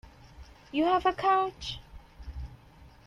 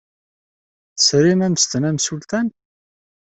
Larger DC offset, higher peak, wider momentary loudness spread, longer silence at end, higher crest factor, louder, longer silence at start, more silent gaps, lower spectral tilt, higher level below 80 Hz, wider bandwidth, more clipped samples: neither; second, -12 dBFS vs -2 dBFS; first, 21 LU vs 10 LU; second, 0.2 s vs 0.8 s; about the same, 18 dB vs 18 dB; second, -28 LUFS vs -17 LUFS; second, 0.4 s vs 0.95 s; neither; first, -5.5 dB/octave vs -4 dB/octave; first, -48 dBFS vs -58 dBFS; first, 12 kHz vs 8.4 kHz; neither